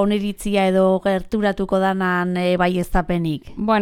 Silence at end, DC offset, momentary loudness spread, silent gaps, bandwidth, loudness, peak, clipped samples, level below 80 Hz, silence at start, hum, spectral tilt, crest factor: 0 s; under 0.1%; 6 LU; none; 16 kHz; -20 LUFS; -4 dBFS; under 0.1%; -36 dBFS; 0 s; none; -6.5 dB/octave; 14 dB